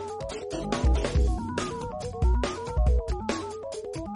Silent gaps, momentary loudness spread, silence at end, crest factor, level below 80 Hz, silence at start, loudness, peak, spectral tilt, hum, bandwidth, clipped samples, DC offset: none; 9 LU; 0 s; 14 dB; -28 dBFS; 0 s; -29 LUFS; -12 dBFS; -6 dB/octave; none; 11 kHz; under 0.1%; under 0.1%